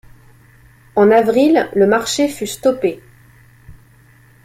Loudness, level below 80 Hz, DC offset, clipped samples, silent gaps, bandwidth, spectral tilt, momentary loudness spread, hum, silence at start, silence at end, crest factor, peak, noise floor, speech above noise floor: -15 LUFS; -52 dBFS; under 0.1%; under 0.1%; none; 16 kHz; -4.5 dB/octave; 10 LU; none; 0.95 s; 0.75 s; 16 dB; -2 dBFS; -48 dBFS; 34 dB